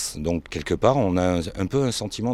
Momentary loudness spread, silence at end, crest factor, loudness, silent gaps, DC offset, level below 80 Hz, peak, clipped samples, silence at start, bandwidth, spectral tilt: 8 LU; 0 s; 20 dB; -23 LUFS; none; under 0.1%; -44 dBFS; -2 dBFS; under 0.1%; 0 s; 15.5 kHz; -5.5 dB/octave